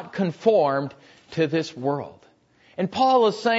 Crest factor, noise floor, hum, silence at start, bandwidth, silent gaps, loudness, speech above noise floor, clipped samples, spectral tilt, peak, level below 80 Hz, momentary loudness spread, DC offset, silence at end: 18 dB; -58 dBFS; none; 0 s; 8 kHz; none; -23 LUFS; 36 dB; under 0.1%; -6 dB/octave; -6 dBFS; -68 dBFS; 16 LU; under 0.1%; 0 s